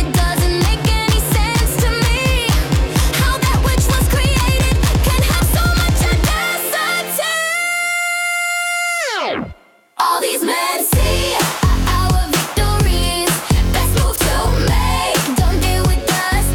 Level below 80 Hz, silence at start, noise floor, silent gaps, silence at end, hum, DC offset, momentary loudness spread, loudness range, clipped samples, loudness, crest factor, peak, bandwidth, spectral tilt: -20 dBFS; 0 s; -40 dBFS; none; 0 s; none; under 0.1%; 2 LU; 2 LU; under 0.1%; -16 LUFS; 12 dB; -4 dBFS; 18 kHz; -4 dB/octave